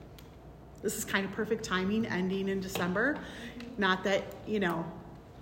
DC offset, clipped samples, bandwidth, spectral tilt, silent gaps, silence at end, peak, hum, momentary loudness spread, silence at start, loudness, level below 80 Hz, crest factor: under 0.1%; under 0.1%; 16.5 kHz; -4.5 dB/octave; none; 0 s; -12 dBFS; none; 20 LU; 0 s; -32 LUFS; -56 dBFS; 20 dB